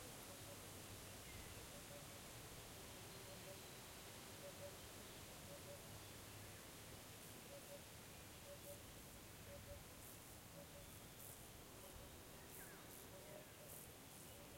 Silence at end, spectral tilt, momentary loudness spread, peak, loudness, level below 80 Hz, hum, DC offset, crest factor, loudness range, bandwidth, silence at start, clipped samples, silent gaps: 0 s; -3 dB/octave; 3 LU; -40 dBFS; -57 LUFS; -70 dBFS; none; under 0.1%; 18 dB; 2 LU; 16.5 kHz; 0 s; under 0.1%; none